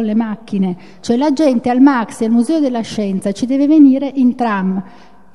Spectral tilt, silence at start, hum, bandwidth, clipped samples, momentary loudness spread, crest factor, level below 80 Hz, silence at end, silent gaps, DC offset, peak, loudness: -6.5 dB/octave; 0 s; none; 11.5 kHz; under 0.1%; 10 LU; 14 dB; -58 dBFS; 0.45 s; none; 0.9%; 0 dBFS; -14 LUFS